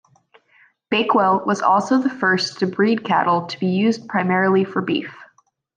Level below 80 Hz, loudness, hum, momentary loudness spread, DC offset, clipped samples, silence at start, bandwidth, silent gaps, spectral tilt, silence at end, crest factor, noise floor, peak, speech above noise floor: -68 dBFS; -19 LUFS; none; 6 LU; under 0.1%; under 0.1%; 0.9 s; 9.2 kHz; none; -5.5 dB/octave; 0.55 s; 16 dB; -59 dBFS; -4 dBFS; 40 dB